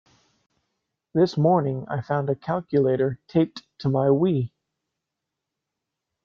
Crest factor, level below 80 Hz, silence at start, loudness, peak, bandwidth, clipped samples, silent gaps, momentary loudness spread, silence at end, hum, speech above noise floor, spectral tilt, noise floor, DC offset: 18 dB; -64 dBFS; 1.15 s; -23 LUFS; -6 dBFS; 7 kHz; under 0.1%; none; 8 LU; 1.8 s; none; 62 dB; -9 dB/octave; -84 dBFS; under 0.1%